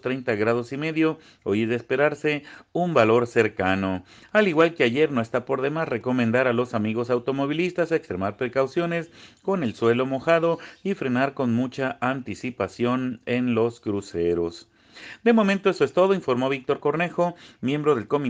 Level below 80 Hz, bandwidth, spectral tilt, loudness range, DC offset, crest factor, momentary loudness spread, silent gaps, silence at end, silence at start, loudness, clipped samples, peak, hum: -62 dBFS; 9.4 kHz; -7 dB/octave; 4 LU; under 0.1%; 18 dB; 9 LU; none; 0 s; 0.05 s; -24 LUFS; under 0.1%; -4 dBFS; none